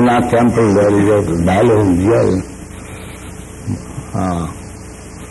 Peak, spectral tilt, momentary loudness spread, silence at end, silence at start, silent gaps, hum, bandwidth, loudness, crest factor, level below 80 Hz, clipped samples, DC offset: -2 dBFS; -7 dB/octave; 20 LU; 0 s; 0 s; none; none; 12 kHz; -14 LUFS; 12 dB; -36 dBFS; under 0.1%; under 0.1%